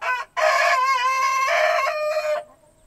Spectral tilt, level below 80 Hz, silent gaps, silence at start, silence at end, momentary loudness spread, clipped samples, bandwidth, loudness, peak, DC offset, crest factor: 1.5 dB/octave; -62 dBFS; none; 0 s; 0.45 s; 7 LU; under 0.1%; 15 kHz; -20 LUFS; -6 dBFS; under 0.1%; 16 dB